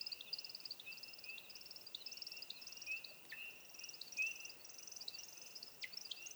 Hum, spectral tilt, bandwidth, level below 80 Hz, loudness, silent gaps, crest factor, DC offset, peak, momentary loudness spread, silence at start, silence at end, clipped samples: none; 1.5 dB/octave; over 20 kHz; -88 dBFS; -48 LUFS; none; 20 dB; under 0.1%; -32 dBFS; 10 LU; 0 s; 0 s; under 0.1%